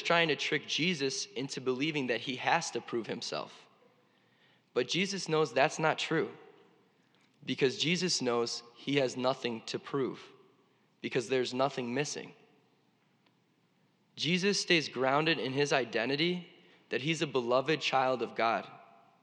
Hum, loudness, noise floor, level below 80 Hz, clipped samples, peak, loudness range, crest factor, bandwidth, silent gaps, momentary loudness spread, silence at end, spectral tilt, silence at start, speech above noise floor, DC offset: none; -32 LUFS; -71 dBFS; under -90 dBFS; under 0.1%; -12 dBFS; 5 LU; 22 dB; 11 kHz; none; 10 LU; 0.4 s; -4 dB/octave; 0 s; 39 dB; under 0.1%